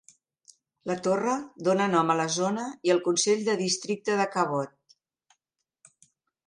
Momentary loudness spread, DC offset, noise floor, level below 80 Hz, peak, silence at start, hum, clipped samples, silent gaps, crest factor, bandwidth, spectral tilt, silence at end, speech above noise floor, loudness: 7 LU; under 0.1%; -83 dBFS; -76 dBFS; -10 dBFS; 0.85 s; none; under 0.1%; none; 18 dB; 11.5 kHz; -4 dB/octave; 1.8 s; 57 dB; -26 LUFS